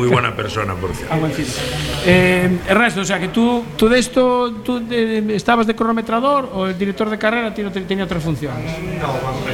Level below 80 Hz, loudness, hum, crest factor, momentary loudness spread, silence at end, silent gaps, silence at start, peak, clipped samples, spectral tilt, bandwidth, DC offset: -38 dBFS; -17 LUFS; none; 16 dB; 8 LU; 0 s; none; 0 s; 0 dBFS; under 0.1%; -5.5 dB/octave; 17.5 kHz; under 0.1%